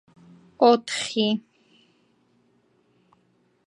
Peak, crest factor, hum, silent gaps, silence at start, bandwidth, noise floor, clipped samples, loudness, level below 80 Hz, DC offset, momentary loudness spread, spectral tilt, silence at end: -4 dBFS; 22 dB; none; none; 0.6 s; 11.5 kHz; -65 dBFS; under 0.1%; -22 LUFS; -78 dBFS; under 0.1%; 8 LU; -4 dB/octave; 2.3 s